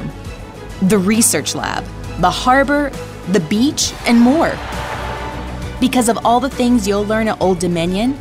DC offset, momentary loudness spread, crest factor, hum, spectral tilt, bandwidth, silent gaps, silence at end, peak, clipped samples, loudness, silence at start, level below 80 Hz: under 0.1%; 14 LU; 14 dB; none; -4 dB/octave; 16 kHz; none; 0 s; -2 dBFS; under 0.1%; -15 LUFS; 0 s; -34 dBFS